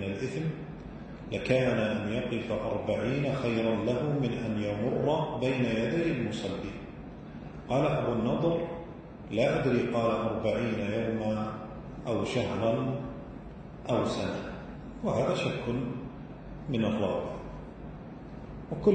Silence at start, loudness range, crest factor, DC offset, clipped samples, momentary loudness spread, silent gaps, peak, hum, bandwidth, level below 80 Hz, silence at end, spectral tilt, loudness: 0 s; 3 LU; 18 dB; under 0.1%; under 0.1%; 16 LU; none; -12 dBFS; none; 9.2 kHz; -52 dBFS; 0 s; -7 dB/octave; -31 LUFS